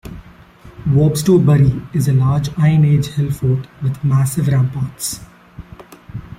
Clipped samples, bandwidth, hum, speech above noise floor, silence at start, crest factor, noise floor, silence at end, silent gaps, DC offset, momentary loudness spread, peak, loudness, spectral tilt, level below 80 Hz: under 0.1%; 16.5 kHz; none; 27 dB; 0.05 s; 14 dB; -41 dBFS; 0.05 s; none; under 0.1%; 12 LU; -2 dBFS; -16 LUFS; -7 dB/octave; -40 dBFS